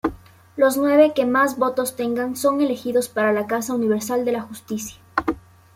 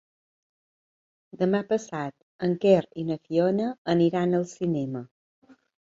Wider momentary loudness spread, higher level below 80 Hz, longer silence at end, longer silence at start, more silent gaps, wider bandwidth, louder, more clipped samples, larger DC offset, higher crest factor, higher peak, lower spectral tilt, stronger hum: about the same, 13 LU vs 12 LU; first, -52 dBFS vs -68 dBFS; second, 0.35 s vs 0.9 s; second, 0.05 s vs 1.35 s; second, none vs 2.22-2.39 s, 3.78-3.85 s; first, 16.5 kHz vs 7.8 kHz; first, -21 LUFS vs -26 LUFS; neither; neither; about the same, 18 dB vs 20 dB; first, -4 dBFS vs -8 dBFS; second, -4.5 dB/octave vs -7.5 dB/octave; neither